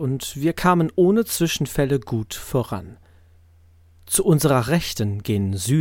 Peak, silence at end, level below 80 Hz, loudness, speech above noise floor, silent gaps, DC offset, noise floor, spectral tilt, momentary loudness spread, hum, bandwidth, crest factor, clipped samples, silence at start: -4 dBFS; 0 s; -44 dBFS; -21 LUFS; 32 dB; none; under 0.1%; -52 dBFS; -5.5 dB/octave; 8 LU; none; 17 kHz; 16 dB; under 0.1%; 0 s